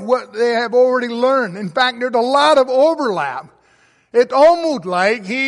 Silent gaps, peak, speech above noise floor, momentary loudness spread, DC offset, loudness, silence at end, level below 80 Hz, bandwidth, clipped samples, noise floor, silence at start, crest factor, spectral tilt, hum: none; -2 dBFS; 40 dB; 8 LU; under 0.1%; -15 LUFS; 0 s; -62 dBFS; 11.5 kHz; under 0.1%; -55 dBFS; 0 s; 14 dB; -4.5 dB/octave; none